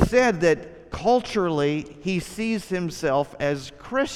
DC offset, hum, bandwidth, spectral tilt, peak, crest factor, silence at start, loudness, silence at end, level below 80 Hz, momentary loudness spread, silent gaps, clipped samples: under 0.1%; none; 14.5 kHz; -5.5 dB/octave; -4 dBFS; 20 dB; 0 s; -24 LUFS; 0 s; -44 dBFS; 9 LU; none; under 0.1%